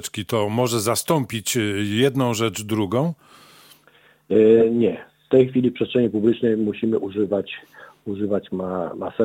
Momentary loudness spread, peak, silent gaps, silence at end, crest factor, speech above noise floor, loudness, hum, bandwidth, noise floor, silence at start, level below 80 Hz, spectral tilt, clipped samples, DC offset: 10 LU; -4 dBFS; none; 0 s; 18 dB; 35 dB; -21 LUFS; none; 17 kHz; -55 dBFS; 0 s; -60 dBFS; -5.5 dB/octave; under 0.1%; under 0.1%